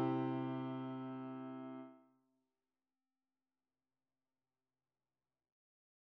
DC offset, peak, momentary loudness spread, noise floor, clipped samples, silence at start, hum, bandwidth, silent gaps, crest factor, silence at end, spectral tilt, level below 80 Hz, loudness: under 0.1%; -28 dBFS; 13 LU; under -90 dBFS; under 0.1%; 0 s; none; 5.2 kHz; none; 20 dB; 4.1 s; -7.5 dB/octave; under -90 dBFS; -44 LUFS